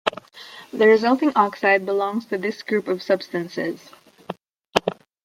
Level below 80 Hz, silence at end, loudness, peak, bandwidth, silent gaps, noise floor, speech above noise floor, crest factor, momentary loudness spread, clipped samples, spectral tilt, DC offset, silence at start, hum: -62 dBFS; 0.3 s; -21 LUFS; 0 dBFS; 15.5 kHz; none; -43 dBFS; 22 dB; 22 dB; 21 LU; under 0.1%; -5 dB/octave; under 0.1%; 0.05 s; none